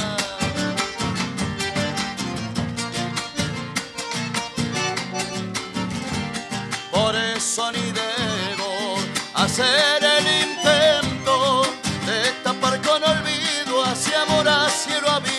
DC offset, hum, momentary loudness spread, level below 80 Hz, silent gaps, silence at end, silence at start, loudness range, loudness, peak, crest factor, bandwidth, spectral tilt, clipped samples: under 0.1%; none; 10 LU; -50 dBFS; none; 0 s; 0 s; 8 LU; -21 LUFS; -4 dBFS; 18 dB; 13 kHz; -3 dB/octave; under 0.1%